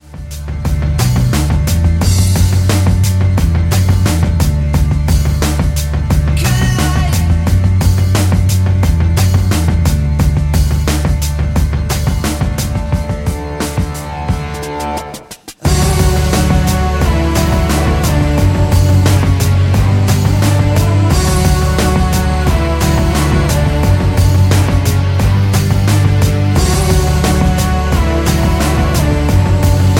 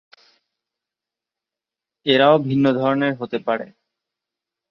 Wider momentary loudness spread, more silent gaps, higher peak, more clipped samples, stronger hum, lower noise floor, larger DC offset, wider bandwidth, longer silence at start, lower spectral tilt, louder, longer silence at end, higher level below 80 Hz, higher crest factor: second, 6 LU vs 12 LU; neither; about the same, 0 dBFS vs -2 dBFS; neither; neither; second, -32 dBFS vs -88 dBFS; neither; first, 17 kHz vs 6 kHz; second, 0.1 s vs 2.05 s; second, -6 dB/octave vs -8 dB/octave; first, -13 LUFS vs -19 LUFS; second, 0 s vs 1.05 s; first, -16 dBFS vs -66 dBFS; second, 12 dB vs 20 dB